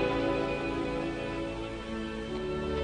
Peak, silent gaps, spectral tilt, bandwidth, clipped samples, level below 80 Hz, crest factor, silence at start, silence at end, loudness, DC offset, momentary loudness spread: -16 dBFS; none; -6.5 dB/octave; 10 kHz; under 0.1%; -46 dBFS; 16 dB; 0 s; 0 s; -33 LUFS; under 0.1%; 7 LU